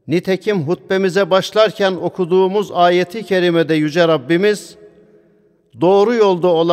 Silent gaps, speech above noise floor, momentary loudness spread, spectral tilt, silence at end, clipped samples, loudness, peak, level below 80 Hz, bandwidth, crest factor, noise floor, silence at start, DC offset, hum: none; 40 dB; 5 LU; -6 dB/octave; 0 s; under 0.1%; -15 LUFS; 0 dBFS; -64 dBFS; 14.5 kHz; 14 dB; -54 dBFS; 0.05 s; under 0.1%; none